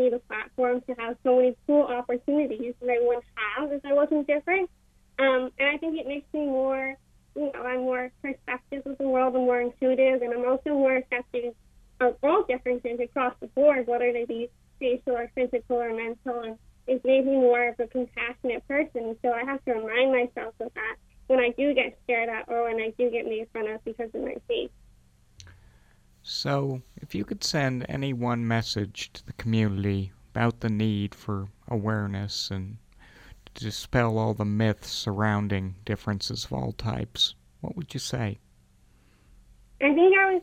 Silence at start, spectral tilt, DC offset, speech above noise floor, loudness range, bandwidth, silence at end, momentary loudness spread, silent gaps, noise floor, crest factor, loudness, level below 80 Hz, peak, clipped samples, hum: 0 s; -6 dB/octave; under 0.1%; 33 dB; 6 LU; 15 kHz; 0 s; 12 LU; none; -59 dBFS; 18 dB; -27 LUFS; -54 dBFS; -8 dBFS; under 0.1%; none